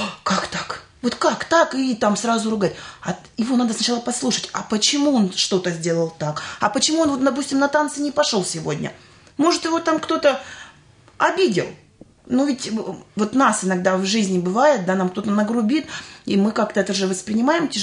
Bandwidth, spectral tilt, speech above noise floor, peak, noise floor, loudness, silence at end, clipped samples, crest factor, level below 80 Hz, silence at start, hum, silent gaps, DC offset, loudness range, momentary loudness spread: 11 kHz; -4 dB/octave; 30 dB; -4 dBFS; -50 dBFS; -20 LUFS; 0 s; under 0.1%; 16 dB; -60 dBFS; 0 s; none; none; under 0.1%; 2 LU; 10 LU